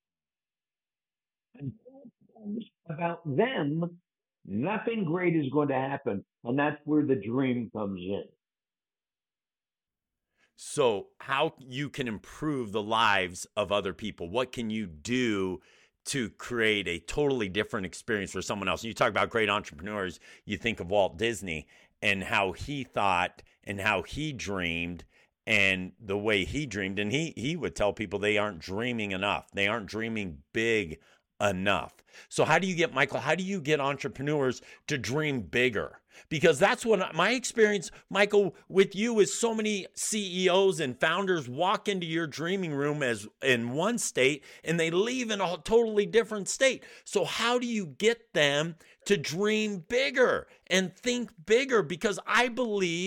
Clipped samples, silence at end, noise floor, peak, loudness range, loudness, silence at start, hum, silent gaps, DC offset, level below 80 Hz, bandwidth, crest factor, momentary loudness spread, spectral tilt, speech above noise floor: under 0.1%; 0 s; under -90 dBFS; -10 dBFS; 6 LU; -29 LUFS; 1.6 s; none; none; under 0.1%; -58 dBFS; 16.5 kHz; 20 dB; 11 LU; -4 dB/octave; over 61 dB